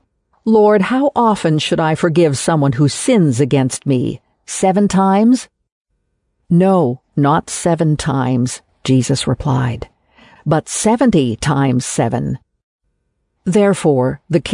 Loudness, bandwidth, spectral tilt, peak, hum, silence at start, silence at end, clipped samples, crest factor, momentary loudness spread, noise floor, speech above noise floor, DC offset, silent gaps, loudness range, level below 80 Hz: -15 LUFS; 11 kHz; -6 dB/octave; -2 dBFS; none; 0.45 s; 0 s; under 0.1%; 12 dB; 9 LU; -68 dBFS; 54 dB; under 0.1%; 5.72-5.85 s, 12.63-12.79 s; 3 LU; -44 dBFS